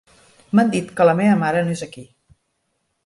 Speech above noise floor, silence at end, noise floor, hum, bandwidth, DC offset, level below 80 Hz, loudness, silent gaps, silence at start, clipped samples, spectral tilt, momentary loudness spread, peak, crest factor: 54 dB; 1 s; -71 dBFS; none; 11.5 kHz; under 0.1%; -60 dBFS; -18 LUFS; none; 0.55 s; under 0.1%; -7 dB/octave; 11 LU; -4 dBFS; 16 dB